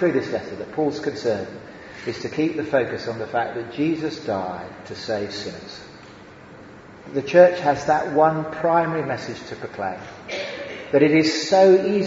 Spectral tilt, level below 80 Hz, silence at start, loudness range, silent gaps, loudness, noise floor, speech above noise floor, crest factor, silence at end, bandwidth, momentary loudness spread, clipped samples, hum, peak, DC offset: -5.5 dB/octave; -58 dBFS; 0 s; 8 LU; none; -21 LUFS; -43 dBFS; 22 dB; 20 dB; 0 s; 7.8 kHz; 18 LU; under 0.1%; none; 0 dBFS; under 0.1%